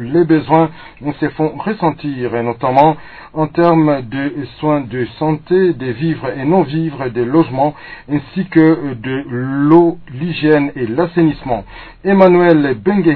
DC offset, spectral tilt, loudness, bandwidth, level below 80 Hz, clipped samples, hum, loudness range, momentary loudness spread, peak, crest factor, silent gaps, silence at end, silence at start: under 0.1%; -10.5 dB/octave; -14 LUFS; 5.4 kHz; -44 dBFS; 0.2%; none; 3 LU; 11 LU; 0 dBFS; 14 dB; none; 0 s; 0 s